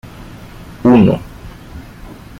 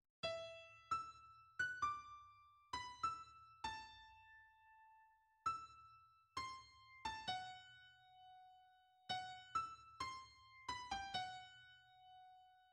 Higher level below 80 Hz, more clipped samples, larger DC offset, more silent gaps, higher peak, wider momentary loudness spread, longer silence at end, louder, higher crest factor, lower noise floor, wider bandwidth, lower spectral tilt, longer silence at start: first, -38 dBFS vs -76 dBFS; neither; neither; neither; first, -2 dBFS vs -32 dBFS; first, 26 LU vs 20 LU; first, 0.25 s vs 0 s; first, -12 LUFS vs -48 LUFS; second, 14 dB vs 20 dB; second, -34 dBFS vs -73 dBFS; first, 14.5 kHz vs 11.5 kHz; first, -8.5 dB/octave vs -2 dB/octave; about the same, 0.2 s vs 0.25 s